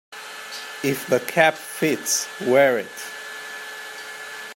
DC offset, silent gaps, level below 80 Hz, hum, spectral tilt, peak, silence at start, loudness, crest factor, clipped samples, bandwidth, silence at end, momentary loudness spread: under 0.1%; none; -74 dBFS; none; -3 dB/octave; -2 dBFS; 0.1 s; -22 LUFS; 22 dB; under 0.1%; 16.5 kHz; 0 s; 16 LU